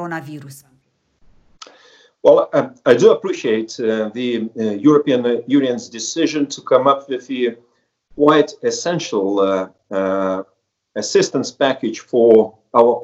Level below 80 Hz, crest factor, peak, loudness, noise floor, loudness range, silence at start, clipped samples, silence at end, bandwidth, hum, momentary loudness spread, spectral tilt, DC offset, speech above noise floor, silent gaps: -64 dBFS; 16 dB; 0 dBFS; -17 LUFS; -59 dBFS; 3 LU; 0 s; under 0.1%; 0 s; 10 kHz; none; 11 LU; -5 dB/octave; under 0.1%; 43 dB; none